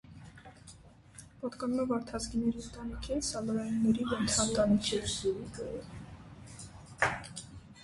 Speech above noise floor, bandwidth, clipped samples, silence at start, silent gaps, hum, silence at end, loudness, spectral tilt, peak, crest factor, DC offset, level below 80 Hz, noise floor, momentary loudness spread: 23 dB; 11.5 kHz; under 0.1%; 0.05 s; none; none; 0 s; -33 LUFS; -4 dB/octave; -12 dBFS; 22 dB; under 0.1%; -52 dBFS; -55 dBFS; 24 LU